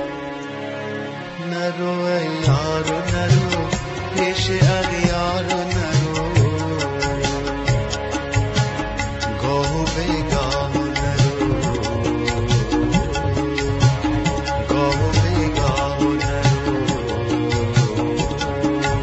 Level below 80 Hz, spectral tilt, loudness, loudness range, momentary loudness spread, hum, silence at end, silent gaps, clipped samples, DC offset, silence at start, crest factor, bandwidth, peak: -32 dBFS; -5.5 dB/octave; -20 LUFS; 2 LU; 6 LU; none; 0 s; none; under 0.1%; under 0.1%; 0 s; 16 dB; 8.2 kHz; -4 dBFS